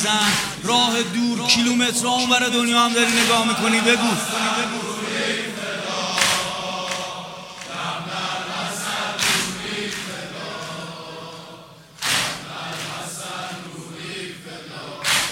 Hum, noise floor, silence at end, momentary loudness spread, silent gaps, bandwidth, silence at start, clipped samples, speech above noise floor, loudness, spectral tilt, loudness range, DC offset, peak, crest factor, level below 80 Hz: none; -43 dBFS; 0 s; 17 LU; none; 16.5 kHz; 0 s; under 0.1%; 24 dB; -20 LUFS; -2 dB/octave; 10 LU; under 0.1%; -2 dBFS; 22 dB; -58 dBFS